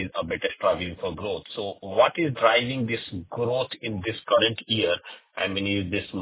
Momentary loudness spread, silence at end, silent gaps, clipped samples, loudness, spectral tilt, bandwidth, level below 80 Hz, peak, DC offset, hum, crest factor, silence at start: 10 LU; 0 s; none; under 0.1%; -25 LUFS; -9 dB/octave; 4 kHz; -52 dBFS; -6 dBFS; under 0.1%; none; 20 dB; 0 s